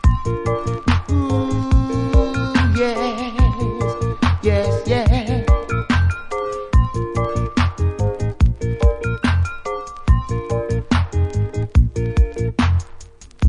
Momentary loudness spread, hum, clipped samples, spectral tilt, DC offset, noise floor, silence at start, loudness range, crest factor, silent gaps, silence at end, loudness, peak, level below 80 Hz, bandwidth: 4 LU; none; under 0.1%; -7 dB/octave; under 0.1%; -37 dBFS; 0.05 s; 2 LU; 16 dB; none; 0 s; -19 LUFS; -2 dBFS; -22 dBFS; 10.5 kHz